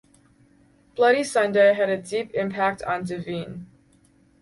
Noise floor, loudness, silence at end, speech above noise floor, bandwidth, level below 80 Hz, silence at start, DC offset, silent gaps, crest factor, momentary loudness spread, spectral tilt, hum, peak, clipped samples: -59 dBFS; -22 LUFS; 0.75 s; 36 dB; 11.5 kHz; -62 dBFS; 0.95 s; under 0.1%; none; 18 dB; 15 LU; -5 dB/octave; none; -6 dBFS; under 0.1%